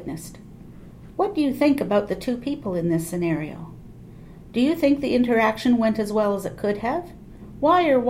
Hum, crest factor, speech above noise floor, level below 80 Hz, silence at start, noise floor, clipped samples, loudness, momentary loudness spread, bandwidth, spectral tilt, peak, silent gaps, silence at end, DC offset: none; 16 dB; 21 dB; -48 dBFS; 0 s; -42 dBFS; under 0.1%; -22 LUFS; 20 LU; 16.5 kHz; -6.5 dB/octave; -8 dBFS; none; 0 s; under 0.1%